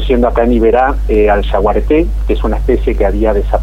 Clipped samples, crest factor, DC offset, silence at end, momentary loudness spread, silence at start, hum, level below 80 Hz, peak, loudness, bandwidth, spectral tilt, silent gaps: under 0.1%; 10 dB; under 0.1%; 0 s; 4 LU; 0 s; none; -16 dBFS; 0 dBFS; -12 LUFS; 4.5 kHz; -8.5 dB/octave; none